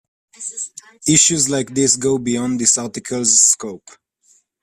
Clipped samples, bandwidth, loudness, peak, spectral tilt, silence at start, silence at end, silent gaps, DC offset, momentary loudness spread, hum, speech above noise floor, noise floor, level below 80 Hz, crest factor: under 0.1%; 14.5 kHz; -15 LUFS; 0 dBFS; -2.5 dB/octave; 0.4 s; 0.85 s; none; under 0.1%; 17 LU; none; 40 dB; -57 dBFS; -56 dBFS; 18 dB